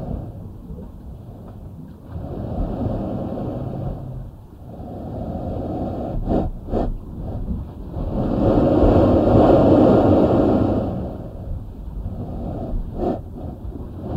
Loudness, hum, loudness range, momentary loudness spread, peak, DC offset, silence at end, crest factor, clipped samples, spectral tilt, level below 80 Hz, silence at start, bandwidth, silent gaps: -20 LUFS; none; 13 LU; 22 LU; -2 dBFS; under 0.1%; 0 s; 18 dB; under 0.1%; -10.5 dB/octave; -30 dBFS; 0 s; 7.8 kHz; none